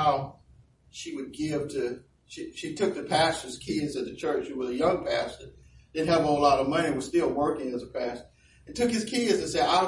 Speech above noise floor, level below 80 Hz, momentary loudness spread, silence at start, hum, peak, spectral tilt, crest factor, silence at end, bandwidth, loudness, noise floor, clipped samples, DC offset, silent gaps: 31 dB; -56 dBFS; 16 LU; 0 s; none; -10 dBFS; -4.5 dB/octave; 18 dB; 0 s; 11.5 kHz; -28 LUFS; -58 dBFS; under 0.1%; under 0.1%; none